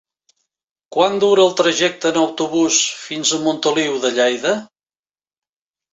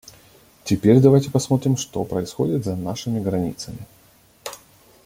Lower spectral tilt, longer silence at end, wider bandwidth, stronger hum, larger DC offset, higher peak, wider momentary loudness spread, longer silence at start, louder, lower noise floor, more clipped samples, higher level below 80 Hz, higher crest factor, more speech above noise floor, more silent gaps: second, -2.5 dB/octave vs -7 dB/octave; first, 1.3 s vs 0.5 s; second, 8.2 kHz vs 16.5 kHz; neither; neither; about the same, -2 dBFS vs -2 dBFS; second, 7 LU vs 22 LU; first, 0.9 s vs 0.65 s; first, -17 LUFS vs -20 LUFS; first, under -90 dBFS vs -54 dBFS; neither; second, -64 dBFS vs -52 dBFS; about the same, 16 dB vs 20 dB; first, over 73 dB vs 35 dB; neither